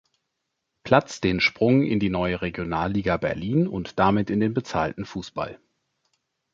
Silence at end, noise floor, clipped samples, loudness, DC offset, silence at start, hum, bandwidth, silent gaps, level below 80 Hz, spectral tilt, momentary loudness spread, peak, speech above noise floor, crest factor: 1 s; -80 dBFS; under 0.1%; -24 LUFS; under 0.1%; 0.85 s; none; 7.8 kHz; none; -48 dBFS; -6.5 dB/octave; 12 LU; -2 dBFS; 56 dB; 22 dB